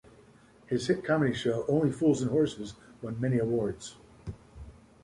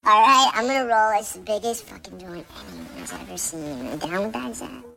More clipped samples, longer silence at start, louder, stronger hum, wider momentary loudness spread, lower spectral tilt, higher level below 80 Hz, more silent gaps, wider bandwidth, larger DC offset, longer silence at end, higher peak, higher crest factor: neither; first, 0.7 s vs 0.05 s; second, -29 LUFS vs -21 LUFS; neither; second, 19 LU vs 23 LU; first, -6.5 dB/octave vs -2 dB/octave; about the same, -56 dBFS vs -56 dBFS; neither; second, 11.5 kHz vs 17 kHz; neither; first, 0.35 s vs 0.05 s; second, -14 dBFS vs -4 dBFS; about the same, 16 dB vs 18 dB